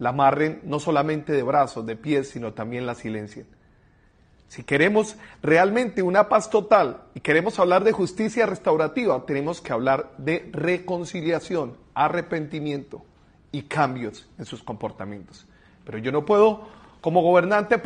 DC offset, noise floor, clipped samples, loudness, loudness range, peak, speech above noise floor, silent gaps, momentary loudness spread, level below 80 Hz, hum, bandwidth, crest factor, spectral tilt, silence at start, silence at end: under 0.1%; -57 dBFS; under 0.1%; -23 LUFS; 9 LU; -4 dBFS; 35 dB; none; 15 LU; -58 dBFS; none; 10 kHz; 20 dB; -6 dB/octave; 0 s; 0 s